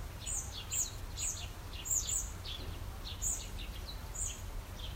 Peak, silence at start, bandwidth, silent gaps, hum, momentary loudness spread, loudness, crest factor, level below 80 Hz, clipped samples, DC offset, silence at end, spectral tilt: -20 dBFS; 0 s; 16 kHz; none; none; 11 LU; -38 LUFS; 20 dB; -46 dBFS; under 0.1%; under 0.1%; 0 s; -1.5 dB/octave